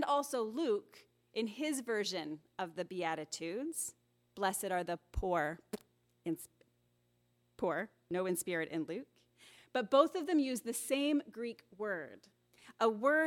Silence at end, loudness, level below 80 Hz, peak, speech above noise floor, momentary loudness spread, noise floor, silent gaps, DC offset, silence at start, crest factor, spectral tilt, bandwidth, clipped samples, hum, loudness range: 0 s; -37 LUFS; -60 dBFS; -14 dBFS; 40 dB; 12 LU; -76 dBFS; none; under 0.1%; 0 s; 22 dB; -3.5 dB/octave; 17.5 kHz; under 0.1%; none; 6 LU